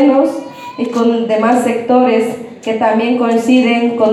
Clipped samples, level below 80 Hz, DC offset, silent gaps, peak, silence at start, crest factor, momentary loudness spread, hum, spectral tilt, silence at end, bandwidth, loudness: under 0.1%; -66 dBFS; under 0.1%; none; 0 dBFS; 0 s; 12 dB; 10 LU; none; -5.5 dB/octave; 0 s; 12.5 kHz; -13 LUFS